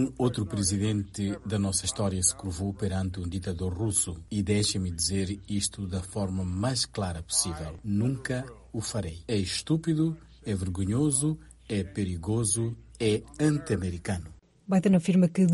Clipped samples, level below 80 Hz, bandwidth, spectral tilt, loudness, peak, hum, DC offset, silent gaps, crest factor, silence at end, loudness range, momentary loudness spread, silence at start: under 0.1%; -50 dBFS; 11.5 kHz; -5 dB/octave; -29 LUFS; -10 dBFS; none; under 0.1%; none; 18 dB; 0 s; 2 LU; 9 LU; 0 s